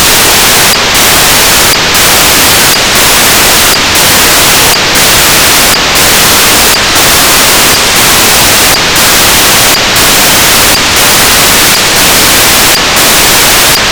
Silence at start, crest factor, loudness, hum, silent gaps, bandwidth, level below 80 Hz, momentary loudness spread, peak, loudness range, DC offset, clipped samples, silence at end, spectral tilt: 0 s; 4 dB; -2 LUFS; none; none; over 20 kHz; -24 dBFS; 1 LU; 0 dBFS; 0 LU; 2%; 20%; 0 s; -1 dB/octave